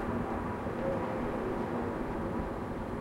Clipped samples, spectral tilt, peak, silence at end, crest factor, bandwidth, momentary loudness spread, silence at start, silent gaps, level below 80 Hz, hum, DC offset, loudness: under 0.1%; -8 dB/octave; -20 dBFS; 0 s; 14 dB; 16 kHz; 3 LU; 0 s; none; -46 dBFS; none; under 0.1%; -35 LUFS